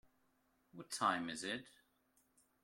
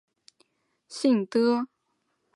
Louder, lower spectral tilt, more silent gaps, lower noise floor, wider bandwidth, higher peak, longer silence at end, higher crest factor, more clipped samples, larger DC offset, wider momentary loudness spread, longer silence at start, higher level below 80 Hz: second, -41 LUFS vs -25 LUFS; second, -2.5 dB/octave vs -5.5 dB/octave; neither; about the same, -78 dBFS vs -76 dBFS; first, 16.5 kHz vs 11.5 kHz; second, -22 dBFS vs -10 dBFS; first, 0.95 s vs 0.7 s; first, 24 dB vs 18 dB; neither; neither; first, 20 LU vs 15 LU; second, 0.75 s vs 0.9 s; about the same, -82 dBFS vs -84 dBFS